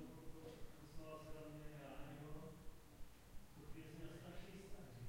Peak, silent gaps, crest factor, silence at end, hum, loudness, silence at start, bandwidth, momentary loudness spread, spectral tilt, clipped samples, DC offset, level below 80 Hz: -38 dBFS; none; 16 dB; 0 s; none; -58 LUFS; 0 s; 16.5 kHz; 8 LU; -6 dB/octave; under 0.1%; under 0.1%; -62 dBFS